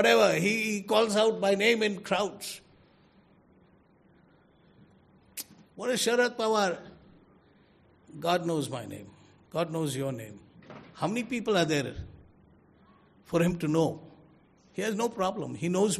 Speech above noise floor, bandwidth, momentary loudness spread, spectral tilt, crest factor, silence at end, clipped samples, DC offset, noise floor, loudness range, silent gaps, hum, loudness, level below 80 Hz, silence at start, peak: 34 dB; 14 kHz; 20 LU; -4.5 dB/octave; 22 dB; 0 s; under 0.1%; under 0.1%; -62 dBFS; 8 LU; none; none; -28 LUFS; -62 dBFS; 0 s; -8 dBFS